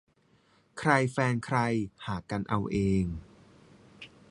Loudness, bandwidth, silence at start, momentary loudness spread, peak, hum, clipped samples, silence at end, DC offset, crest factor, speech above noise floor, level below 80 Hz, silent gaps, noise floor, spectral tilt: -29 LUFS; 11.5 kHz; 0.75 s; 22 LU; -8 dBFS; none; under 0.1%; 0.25 s; under 0.1%; 24 dB; 37 dB; -50 dBFS; none; -66 dBFS; -6.5 dB/octave